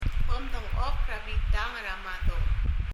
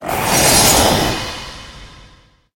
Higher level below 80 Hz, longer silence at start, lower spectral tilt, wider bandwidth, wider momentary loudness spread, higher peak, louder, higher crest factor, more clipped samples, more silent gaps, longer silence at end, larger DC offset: about the same, -28 dBFS vs -32 dBFS; about the same, 0 s vs 0 s; first, -5.5 dB/octave vs -2.5 dB/octave; second, 7.2 kHz vs 17 kHz; second, 4 LU vs 21 LU; second, -14 dBFS vs 0 dBFS; second, -32 LUFS vs -12 LUFS; about the same, 12 dB vs 16 dB; neither; neither; second, 0 s vs 0.6 s; neither